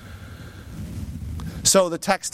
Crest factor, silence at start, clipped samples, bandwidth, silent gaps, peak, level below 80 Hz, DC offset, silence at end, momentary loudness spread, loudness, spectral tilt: 20 dB; 0 s; under 0.1%; 16.5 kHz; none; -4 dBFS; -40 dBFS; under 0.1%; 0.05 s; 23 LU; -21 LUFS; -3 dB/octave